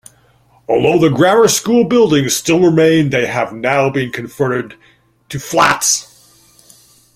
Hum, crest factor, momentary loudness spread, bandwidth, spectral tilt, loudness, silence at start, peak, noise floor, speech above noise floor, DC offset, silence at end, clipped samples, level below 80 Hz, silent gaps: none; 14 dB; 10 LU; 16 kHz; -4 dB/octave; -13 LUFS; 0.7 s; 0 dBFS; -51 dBFS; 39 dB; under 0.1%; 1.1 s; under 0.1%; -50 dBFS; none